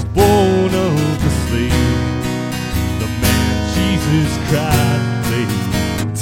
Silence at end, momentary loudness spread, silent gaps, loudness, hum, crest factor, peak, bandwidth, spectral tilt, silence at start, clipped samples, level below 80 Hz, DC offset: 0 s; 7 LU; none; -16 LUFS; none; 16 dB; 0 dBFS; 16.5 kHz; -5.5 dB/octave; 0 s; under 0.1%; -28 dBFS; under 0.1%